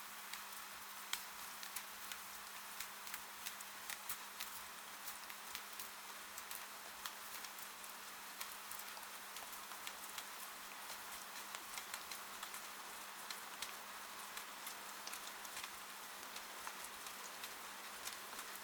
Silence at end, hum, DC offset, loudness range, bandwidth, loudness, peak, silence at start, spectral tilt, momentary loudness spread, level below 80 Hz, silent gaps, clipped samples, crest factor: 0 s; none; under 0.1%; 1 LU; over 20 kHz; -48 LUFS; -20 dBFS; 0 s; 0.5 dB/octave; 3 LU; -82 dBFS; none; under 0.1%; 30 dB